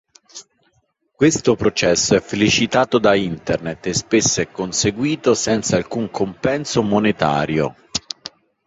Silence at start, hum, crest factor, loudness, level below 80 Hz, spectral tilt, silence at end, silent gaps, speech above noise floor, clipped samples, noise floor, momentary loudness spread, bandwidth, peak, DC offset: 0.35 s; none; 18 dB; -18 LUFS; -46 dBFS; -4 dB/octave; 0.4 s; none; 47 dB; under 0.1%; -65 dBFS; 11 LU; 8 kHz; 0 dBFS; under 0.1%